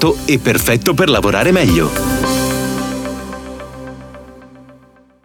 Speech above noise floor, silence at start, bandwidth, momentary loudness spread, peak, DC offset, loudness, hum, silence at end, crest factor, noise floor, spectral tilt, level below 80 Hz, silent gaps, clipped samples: 34 dB; 0 s; over 20 kHz; 19 LU; 0 dBFS; under 0.1%; -14 LUFS; none; 0.5 s; 14 dB; -47 dBFS; -4.5 dB/octave; -32 dBFS; none; under 0.1%